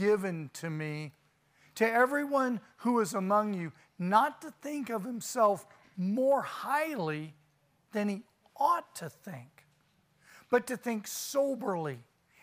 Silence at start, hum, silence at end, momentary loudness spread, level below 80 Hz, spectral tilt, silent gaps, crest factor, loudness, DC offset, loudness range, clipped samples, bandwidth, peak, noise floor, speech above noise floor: 0 s; none; 0.4 s; 16 LU; -82 dBFS; -5 dB/octave; none; 22 dB; -32 LUFS; under 0.1%; 5 LU; under 0.1%; 15.5 kHz; -12 dBFS; -70 dBFS; 39 dB